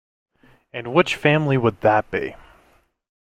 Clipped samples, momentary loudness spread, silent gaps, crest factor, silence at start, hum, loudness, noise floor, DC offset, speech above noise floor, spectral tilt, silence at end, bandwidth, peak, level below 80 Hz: under 0.1%; 15 LU; none; 20 dB; 0.75 s; none; -19 LUFS; -59 dBFS; under 0.1%; 40 dB; -6.5 dB/octave; 0.95 s; 14.5 kHz; -2 dBFS; -52 dBFS